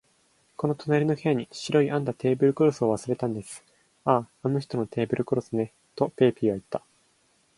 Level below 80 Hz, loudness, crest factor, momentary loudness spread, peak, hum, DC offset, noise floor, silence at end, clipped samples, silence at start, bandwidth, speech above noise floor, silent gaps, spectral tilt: -64 dBFS; -26 LUFS; 20 dB; 10 LU; -6 dBFS; none; under 0.1%; -66 dBFS; 0.8 s; under 0.1%; 0.6 s; 11.5 kHz; 41 dB; none; -7 dB/octave